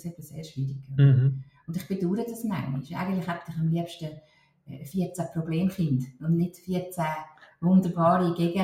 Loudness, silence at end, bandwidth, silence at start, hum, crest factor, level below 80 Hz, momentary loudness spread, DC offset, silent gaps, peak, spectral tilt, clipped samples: -27 LUFS; 0 s; 15.5 kHz; 0.05 s; none; 18 dB; -62 dBFS; 15 LU; under 0.1%; none; -8 dBFS; -8 dB/octave; under 0.1%